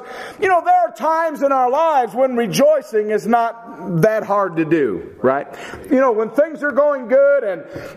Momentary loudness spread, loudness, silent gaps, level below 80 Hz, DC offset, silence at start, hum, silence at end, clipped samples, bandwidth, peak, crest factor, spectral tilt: 9 LU; -17 LUFS; none; -58 dBFS; under 0.1%; 0 s; none; 0 s; under 0.1%; 15 kHz; 0 dBFS; 16 dB; -6 dB/octave